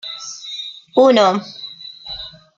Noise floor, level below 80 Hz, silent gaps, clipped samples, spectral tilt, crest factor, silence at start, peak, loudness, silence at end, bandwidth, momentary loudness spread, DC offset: -35 dBFS; -56 dBFS; none; under 0.1%; -4 dB/octave; 18 dB; 0.05 s; 0 dBFS; -16 LUFS; 0.3 s; 7.6 kHz; 20 LU; under 0.1%